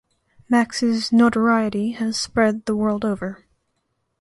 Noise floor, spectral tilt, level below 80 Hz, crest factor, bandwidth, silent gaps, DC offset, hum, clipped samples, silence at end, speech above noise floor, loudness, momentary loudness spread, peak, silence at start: -72 dBFS; -5 dB/octave; -54 dBFS; 18 dB; 11.5 kHz; none; under 0.1%; none; under 0.1%; 0.85 s; 53 dB; -20 LUFS; 7 LU; -4 dBFS; 0.5 s